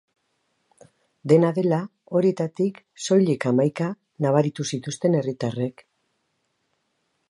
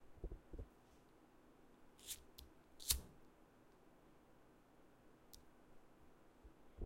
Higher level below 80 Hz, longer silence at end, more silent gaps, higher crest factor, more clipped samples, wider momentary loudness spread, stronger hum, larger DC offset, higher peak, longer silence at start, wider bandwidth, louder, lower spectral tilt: second, -72 dBFS vs -60 dBFS; first, 1.6 s vs 0 s; neither; second, 20 dB vs 36 dB; neither; second, 10 LU vs 28 LU; neither; neither; first, -4 dBFS vs -20 dBFS; first, 1.25 s vs 0 s; second, 11 kHz vs 16 kHz; first, -23 LUFS vs -47 LUFS; first, -6.5 dB/octave vs -2 dB/octave